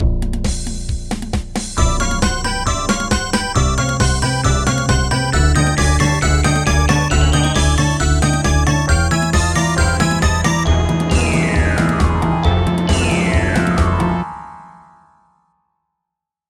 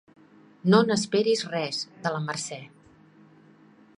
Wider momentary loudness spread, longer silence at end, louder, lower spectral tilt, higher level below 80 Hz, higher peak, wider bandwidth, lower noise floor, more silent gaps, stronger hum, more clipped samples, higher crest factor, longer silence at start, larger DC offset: second, 7 LU vs 12 LU; first, 1.8 s vs 1.3 s; first, -16 LUFS vs -25 LUFS; about the same, -4.5 dB/octave vs -5 dB/octave; first, -20 dBFS vs -70 dBFS; first, 0 dBFS vs -4 dBFS; first, 14 kHz vs 11.5 kHz; first, -81 dBFS vs -55 dBFS; neither; neither; neither; second, 16 dB vs 24 dB; second, 0 s vs 0.65 s; neither